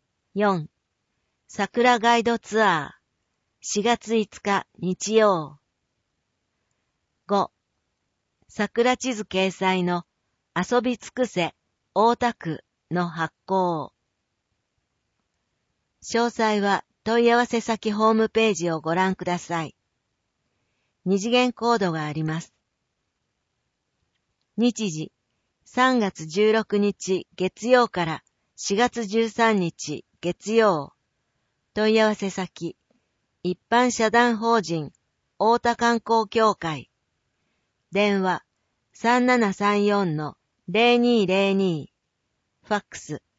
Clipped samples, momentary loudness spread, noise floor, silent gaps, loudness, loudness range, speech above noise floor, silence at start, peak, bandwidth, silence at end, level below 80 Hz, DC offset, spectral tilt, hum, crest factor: under 0.1%; 13 LU; -77 dBFS; none; -23 LUFS; 6 LU; 55 dB; 0.35 s; -4 dBFS; 8 kHz; 0.2 s; -64 dBFS; under 0.1%; -4.5 dB/octave; none; 20 dB